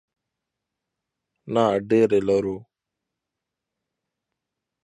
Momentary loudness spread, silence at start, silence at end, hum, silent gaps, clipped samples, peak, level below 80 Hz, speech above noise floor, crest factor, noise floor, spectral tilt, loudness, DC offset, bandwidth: 11 LU; 1.45 s; 2.25 s; none; none; under 0.1%; -6 dBFS; -62 dBFS; 64 dB; 20 dB; -85 dBFS; -7 dB/octave; -21 LUFS; under 0.1%; 10.5 kHz